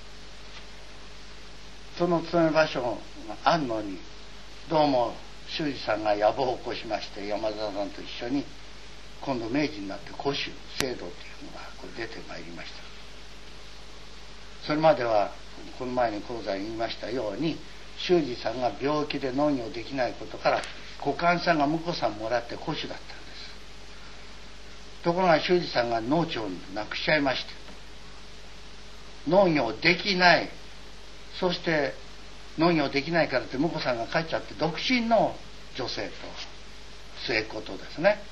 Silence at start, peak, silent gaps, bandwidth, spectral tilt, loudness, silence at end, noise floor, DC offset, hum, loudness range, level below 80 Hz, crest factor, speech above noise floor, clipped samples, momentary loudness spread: 0 s; -4 dBFS; none; 12.5 kHz; -5 dB/octave; -27 LUFS; 0 s; -47 dBFS; 0.9%; none; 8 LU; -50 dBFS; 26 dB; 19 dB; under 0.1%; 23 LU